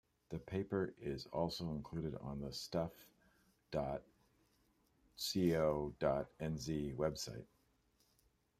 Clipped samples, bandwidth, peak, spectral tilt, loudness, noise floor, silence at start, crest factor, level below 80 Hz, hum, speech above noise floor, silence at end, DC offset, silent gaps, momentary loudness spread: under 0.1%; 15.5 kHz; -22 dBFS; -5.5 dB/octave; -41 LUFS; -77 dBFS; 0.3 s; 22 dB; -62 dBFS; none; 36 dB; 1.15 s; under 0.1%; none; 10 LU